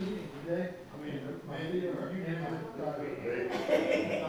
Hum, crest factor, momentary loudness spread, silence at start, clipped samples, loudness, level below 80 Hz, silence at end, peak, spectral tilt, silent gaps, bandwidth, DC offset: none; 20 dB; 10 LU; 0 s; under 0.1%; -35 LUFS; -66 dBFS; 0 s; -16 dBFS; -6.5 dB/octave; none; over 20 kHz; under 0.1%